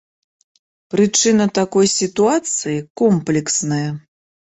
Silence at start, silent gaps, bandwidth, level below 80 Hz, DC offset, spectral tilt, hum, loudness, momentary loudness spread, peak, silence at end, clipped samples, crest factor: 0.95 s; 2.90-2.95 s; 8.4 kHz; -56 dBFS; under 0.1%; -4 dB/octave; none; -17 LUFS; 9 LU; -4 dBFS; 0.45 s; under 0.1%; 14 dB